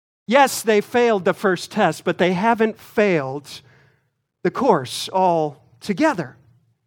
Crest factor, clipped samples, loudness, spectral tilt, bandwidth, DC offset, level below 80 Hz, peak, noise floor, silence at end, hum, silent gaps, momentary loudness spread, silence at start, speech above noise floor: 18 dB; under 0.1%; -19 LUFS; -5 dB/octave; 19 kHz; under 0.1%; -66 dBFS; -2 dBFS; -68 dBFS; 0.55 s; none; none; 12 LU; 0.3 s; 49 dB